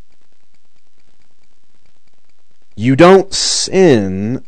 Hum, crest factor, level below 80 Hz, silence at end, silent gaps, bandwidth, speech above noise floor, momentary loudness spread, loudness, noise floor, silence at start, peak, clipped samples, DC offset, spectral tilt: none; 14 dB; -46 dBFS; 0.1 s; none; 9.8 kHz; 52 dB; 10 LU; -10 LUFS; -62 dBFS; 2.8 s; 0 dBFS; 1%; 4%; -4.5 dB/octave